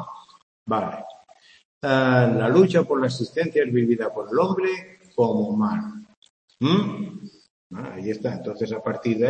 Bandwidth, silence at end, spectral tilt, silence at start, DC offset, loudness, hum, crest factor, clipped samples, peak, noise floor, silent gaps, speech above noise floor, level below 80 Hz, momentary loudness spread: 8.8 kHz; 0 s; -7.5 dB/octave; 0 s; under 0.1%; -23 LUFS; none; 20 dB; under 0.1%; -4 dBFS; -53 dBFS; 0.42-0.66 s, 1.65-1.81 s, 6.17-6.22 s, 6.30-6.48 s, 7.50-7.70 s; 31 dB; -66 dBFS; 18 LU